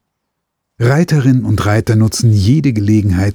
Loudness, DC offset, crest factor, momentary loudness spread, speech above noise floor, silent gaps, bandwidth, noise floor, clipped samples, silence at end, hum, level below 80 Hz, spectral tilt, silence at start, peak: -12 LUFS; under 0.1%; 12 dB; 2 LU; 62 dB; none; 16 kHz; -73 dBFS; under 0.1%; 0 s; none; -38 dBFS; -6.5 dB/octave; 0.8 s; 0 dBFS